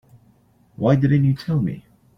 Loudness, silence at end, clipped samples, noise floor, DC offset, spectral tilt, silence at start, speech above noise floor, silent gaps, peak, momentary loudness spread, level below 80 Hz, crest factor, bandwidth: -20 LUFS; 0.4 s; under 0.1%; -57 dBFS; under 0.1%; -9.5 dB/octave; 0.8 s; 39 dB; none; -4 dBFS; 10 LU; -50 dBFS; 16 dB; 6.2 kHz